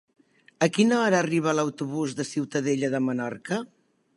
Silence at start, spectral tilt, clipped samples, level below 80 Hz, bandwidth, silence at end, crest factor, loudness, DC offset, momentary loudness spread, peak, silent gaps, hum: 0.6 s; -5 dB/octave; under 0.1%; -74 dBFS; 11.5 kHz; 0.5 s; 20 dB; -25 LUFS; under 0.1%; 10 LU; -6 dBFS; none; none